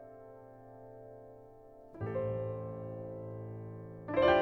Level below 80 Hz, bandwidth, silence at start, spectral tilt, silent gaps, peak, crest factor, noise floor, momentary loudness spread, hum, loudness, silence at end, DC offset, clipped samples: -60 dBFS; 6 kHz; 0 s; -8.5 dB/octave; none; -14 dBFS; 22 dB; -55 dBFS; 18 LU; none; -37 LUFS; 0 s; under 0.1%; under 0.1%